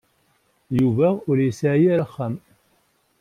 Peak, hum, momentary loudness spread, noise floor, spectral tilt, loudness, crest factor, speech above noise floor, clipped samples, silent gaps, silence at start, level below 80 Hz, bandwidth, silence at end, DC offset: -8 dBFS; none; 11 LU; -64 dBFS; -8.5 dB/octave; -21 LUFS; 14 dB; 45 dB; under 0.1%; none; 0.7 s; -60 dBFS; 13.5 kHz; 0.85 s; under 0.1%